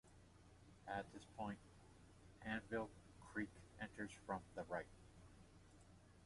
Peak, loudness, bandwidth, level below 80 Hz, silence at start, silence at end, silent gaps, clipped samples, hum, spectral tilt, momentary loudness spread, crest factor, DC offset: -32 dBFS; -51 LUFS; 11.5 kHz; -70 dBFS; 0.05 s; 0 s; none; under 0.1%; none; -5.5 dB/octave; 19 LU; 22 dB; under 0.1%